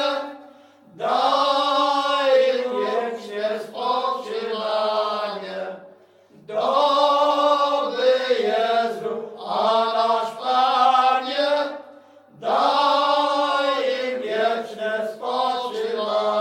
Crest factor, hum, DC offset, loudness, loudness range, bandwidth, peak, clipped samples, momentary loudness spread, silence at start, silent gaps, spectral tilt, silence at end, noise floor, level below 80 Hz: 16 dB; none; under 0.1%; -21 LUFS; 4 LU; 15.5 kHz; -4 dBFS; under 0.1%; 11 LU; 0 s; none; -3 dB/octave; 0 s; -51 dBFS; -80 dBFS